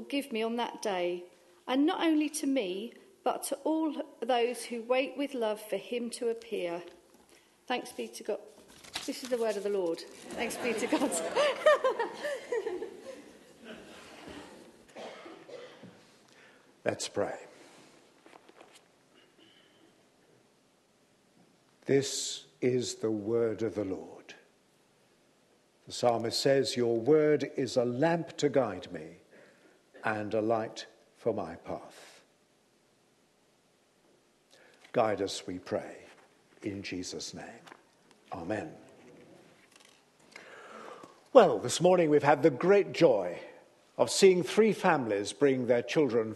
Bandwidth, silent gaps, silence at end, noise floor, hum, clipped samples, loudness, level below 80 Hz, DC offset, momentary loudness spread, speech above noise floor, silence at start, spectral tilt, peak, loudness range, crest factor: 12.5 kHz; none; 0 s; -68 dBFS; none; under 0.1%; -30 LUFS; -76 dBFS; under 0.1%; 23 LU; 38 dB; 0 s; -4.5 dB/octave; -6 dBFS; 16 LU; 26 dB